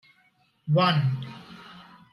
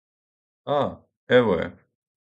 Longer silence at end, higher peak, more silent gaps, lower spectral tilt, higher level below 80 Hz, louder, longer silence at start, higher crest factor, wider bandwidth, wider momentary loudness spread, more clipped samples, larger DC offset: second, 0.3 s vs 0.65 s; second, -10 dBFS vs -4 dBFS; second, none vs 1.17-1.27 s; about the same, -8 dB/octave vs -7.5 dB/octave; second, -68 dBFS vs -54 dBFS; about the same, -24 LUFS vs -23 LUFS; about the same, 0.65 s vs 0.65 s; about the same, 18 dB vs 22 dB; first, 11 kHz vs 7.2 kHz; first, 24 LU vs 14 LU; neither; neither